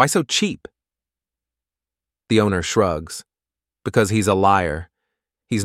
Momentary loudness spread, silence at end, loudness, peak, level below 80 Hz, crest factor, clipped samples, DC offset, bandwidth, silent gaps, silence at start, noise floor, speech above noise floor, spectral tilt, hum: 15 LU; 0 s; -19 LUFS; -2 dBFS; -50 dBFS; 20 dB; under 0.1%; under 0.1%; 16 kHz; none; 0 s; under -90 dBFS; over 71 dB; -4.5 dB/octave; none